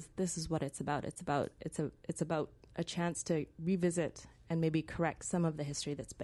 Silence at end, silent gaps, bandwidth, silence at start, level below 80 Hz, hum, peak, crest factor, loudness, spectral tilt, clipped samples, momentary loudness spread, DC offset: 0 s; none; 11.5 kHz; 0 s; -60 dBFS; none; -18 dBFS; 18 dB; -37 LUFS; -5.5 dB/octave; under 0.1%; 7 LU; under 0.1%